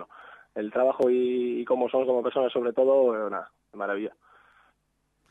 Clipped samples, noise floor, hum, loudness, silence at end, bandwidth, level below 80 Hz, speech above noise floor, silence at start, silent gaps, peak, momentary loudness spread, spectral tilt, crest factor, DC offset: under 0.1%; -74 dBFS; none; -26 LUFS; 1.2 s; 4 kHz; -76 dBFS; 49 dB; 0 s; none; -12 dBFS; 14 LU; -7 dB/octave; 16 dB; under 0.1%